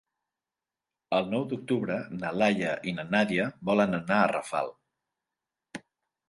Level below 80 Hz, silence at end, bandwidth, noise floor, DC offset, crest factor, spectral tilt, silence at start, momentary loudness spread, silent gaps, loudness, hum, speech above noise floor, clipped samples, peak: -66 dBFS; 0.5 s; 11.5 kHz; under -90 dBFS; under 0.1%; 20 dB; -6 dB/octave; 1.1 s; 11 LU; none; -28 LUFS; none; over 62 dB; under 0.1%; -10 dBFS